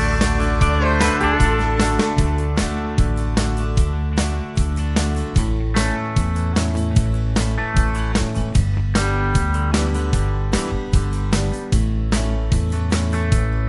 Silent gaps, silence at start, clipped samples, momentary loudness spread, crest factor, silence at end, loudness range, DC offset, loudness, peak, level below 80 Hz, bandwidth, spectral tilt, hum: none; 0 s; under 0.1%; 4 LU; 16 dB; 0 s; 2 LU; under 0.1%; -20 LUFS; -2 dBFS; -22 dBFS; 11.5 kHz; -5.5 dB/octave; none